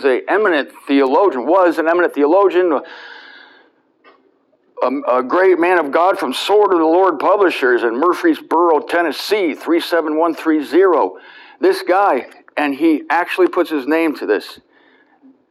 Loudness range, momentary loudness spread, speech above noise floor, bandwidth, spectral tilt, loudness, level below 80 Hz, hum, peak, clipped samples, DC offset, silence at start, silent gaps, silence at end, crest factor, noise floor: 4 LU; 7 LU; 43 dB; 13 kHz; -4 dB/octave; -15 LUFS; -78 dBFS; none; -2 dBFS; under 0.1%; under 0.1%; 0 s; none; 0.95 s; 14 dB; -58 dBFS